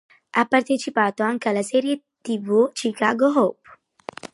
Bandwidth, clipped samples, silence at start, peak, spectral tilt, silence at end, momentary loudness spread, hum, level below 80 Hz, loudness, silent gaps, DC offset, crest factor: 11.5 kHz; under 0.1%; 0.35 s; -4 dBFS; -4.5 dB/octave; 0.1 s; 10 LU; none; -74 dBFS; -21 LUFS; none; under 0.1%; 18 dB